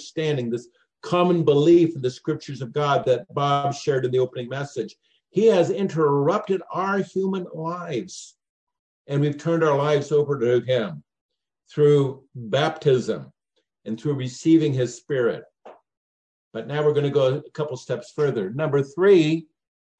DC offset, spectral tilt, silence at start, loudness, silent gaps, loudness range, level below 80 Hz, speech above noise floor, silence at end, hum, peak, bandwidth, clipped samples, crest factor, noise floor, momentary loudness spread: under 0.1%; -7 dB/octave; 0 s; -22 LUFS; 8.49-8.67 s, 8.79-9.05 s, 11.21-11.29 s, 15.97-16.51 s; 4 LU; -70 dBFS; 52 dB; 0.55 s; none; -6 dBFS; 9 kHz; under 0.1%; 16 dB; -74 dBFS; 12 LU